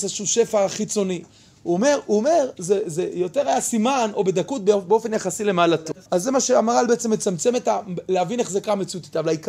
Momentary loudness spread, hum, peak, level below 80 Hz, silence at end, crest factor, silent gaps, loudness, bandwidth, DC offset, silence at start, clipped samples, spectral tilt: 7 LU; none; -4 dBFS; -64 dBFS; 0 s; 16 dB; none; -21 LUFS; 15.5 kHz; under 0.1%; 0 s; under 0.1%; -4 dB/octave